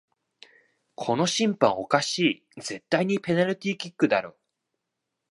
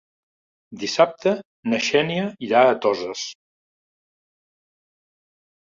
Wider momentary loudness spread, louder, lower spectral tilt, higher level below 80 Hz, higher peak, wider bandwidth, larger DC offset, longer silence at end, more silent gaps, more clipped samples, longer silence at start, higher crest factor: about the same, 12 LU vs 13 LU; second, -25 LUFS vs -21 LUFS; about the same, -4.5 dB/octave vs -4 dB/octave; about the same, -70 dBFS vs -68 dBFS; about the same, -4 dBFS vs -2 dBFS; first, 11.5 kHz vs 7.6 kHz; neither; second, 1 s vs 2.4 s; second, none vs 1.45-1.63 s; neither; first, 1 s vs 0.7 s; about the same, 22 dB vs 22 dB